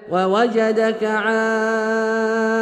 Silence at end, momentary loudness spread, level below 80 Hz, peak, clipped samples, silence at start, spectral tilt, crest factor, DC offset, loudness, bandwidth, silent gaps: 0 s; 2 LU; -68 dBFS; -6 dBFS; under 0.1%; 0 s; -5 dB/octave; 12 dB; under 0.1%; -18 LUFS; 10 kHz; none